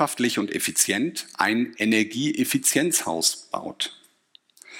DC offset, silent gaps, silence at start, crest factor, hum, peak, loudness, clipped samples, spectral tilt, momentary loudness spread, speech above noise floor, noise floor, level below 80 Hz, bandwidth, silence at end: under 0.1%; none; 0 s; 20 dB; none; -4 dBFS; -23 LUFS; under 0.1%; -2.5 dB/octave; 9 LU; 35 dB; -59 dBFS; -72 dBFS; 17 kHz; 0 s